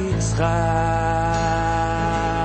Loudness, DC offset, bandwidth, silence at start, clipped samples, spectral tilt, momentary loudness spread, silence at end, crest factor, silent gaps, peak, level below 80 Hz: -21 LUFS; under 0.1%; 8.8 kHz; 0 s; under 0.1%; -6 dB/octave; 2 LU; 0 s; 12 dB; none; -8 dBFS; -30 dBFS